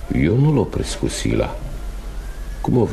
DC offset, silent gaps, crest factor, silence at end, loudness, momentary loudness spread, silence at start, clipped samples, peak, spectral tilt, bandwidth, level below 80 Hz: under 0.1%; none; 14 dB; 0 s; -20 LUFS; 17 LU; 0 s; under 0.1%; -4 dBFS; -6.5 dB/octave; 13.5 kHz; -28 dBFS